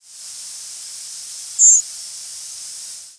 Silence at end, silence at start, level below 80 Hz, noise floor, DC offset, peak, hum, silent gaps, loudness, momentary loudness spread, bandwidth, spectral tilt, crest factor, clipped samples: 0.2 s; 0.25 s; -76 dBFS; -35 dBFS; under 0.1%; -2 dBFS; none; none; -11 LUFS; 20 LU; 11 kHz; 5 dB/octave; 20 dB; under 0.1%